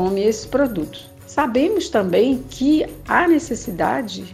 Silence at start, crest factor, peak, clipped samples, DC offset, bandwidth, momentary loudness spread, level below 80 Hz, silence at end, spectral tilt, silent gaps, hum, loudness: 0 s; 16 dB; -2 dBFS; under 0.1%; under 0.1%; 15 kHz; 9 LU; -44 dBFS; 0 s; -5 dB/octave; none; none; -19 LUFS